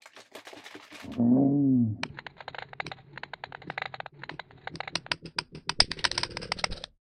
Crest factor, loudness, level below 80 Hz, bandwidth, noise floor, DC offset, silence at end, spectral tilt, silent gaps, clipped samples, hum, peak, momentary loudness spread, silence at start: 28 dB; -29 LUFS; -54 dBFS; 11 kHz; -49 dBFS; under 0.1%; 0.25 s; -4.5 dB/octave; none; under 0.1%; none; -2 dBFS; 21 LU; 0.15 s